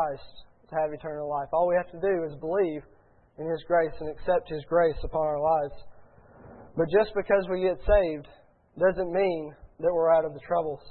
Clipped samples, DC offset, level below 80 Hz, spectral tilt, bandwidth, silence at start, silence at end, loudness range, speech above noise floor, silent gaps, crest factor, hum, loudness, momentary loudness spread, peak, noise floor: under 0.1%; under 0.1%; -44 dBFS; -10.5 dB/octave; 4.4 kHz; 0 s; 0 s; 3 LU; 26 dB; none; 20 dB; none; -27 LUFS; 11 LU; -8 dBFS; -52 dBFS